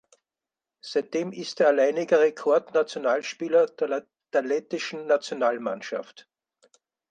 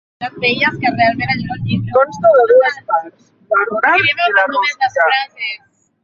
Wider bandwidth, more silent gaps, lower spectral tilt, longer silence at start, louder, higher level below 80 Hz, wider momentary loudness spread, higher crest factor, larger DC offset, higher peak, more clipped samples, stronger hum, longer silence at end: first, 9.2 kHz vs 7.4 kHz; neither; second, -4 dB/octave vs -5.5 dB/octave; first, 0.85 s vs 0.2 s; second, -25 LUFS vs -14 LUFS; second, -82 dBFS vs -50 dBFS; about the same, 11 LU vs 9 LU; about the same, 18 dB vs 14 dB; neither; second, -8 dBFS vs 0 dBFS; neither; neither; first, 1.05 s vs 0.45 s